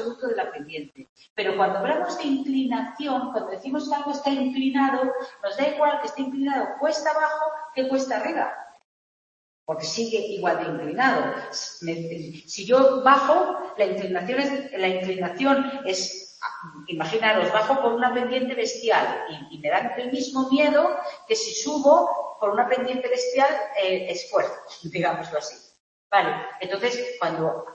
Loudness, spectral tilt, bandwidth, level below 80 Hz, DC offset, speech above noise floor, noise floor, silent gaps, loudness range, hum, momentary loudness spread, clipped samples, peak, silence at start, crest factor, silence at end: -24 LUFS; -4 dB/octave; 8.4 kHz; -72 dBFS; under 0.1%; over 66 dB; under -90 dBFS; 1.09-1.16 s, 1.30-1.36 s, 8.84-9.67 s, 25.80-26.10 s; 5 LU; none; 12 LU; under 0.1%; -4 dBFS; 0 s; 20 dB; 0 s